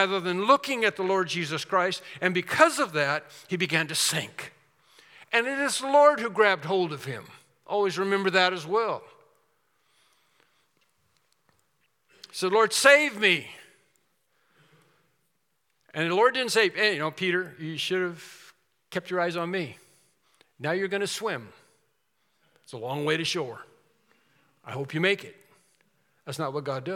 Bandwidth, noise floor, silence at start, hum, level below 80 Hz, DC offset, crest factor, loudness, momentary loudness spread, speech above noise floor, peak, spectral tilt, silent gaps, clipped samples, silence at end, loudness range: 17.5 kHz; -76 dBFS; 0 s; none; -82 dBFS; under 0.1%; 26 dB; -25 LUFS; 16 LU; 50 dB; -2 dBFS; -3.5 dB/octave; none; under 0.1%; 0 s; 9 LU